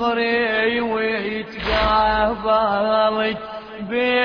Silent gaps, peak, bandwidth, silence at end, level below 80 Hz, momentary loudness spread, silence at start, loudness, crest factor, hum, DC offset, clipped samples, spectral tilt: none; -6 dBFS; 5.4 kHz; 0 s; -38 dBFS; 9 LU; 0 s; -19 LUFS; 14 dB; none; under 0.1%; under 0.1%; -6.5 dB/octave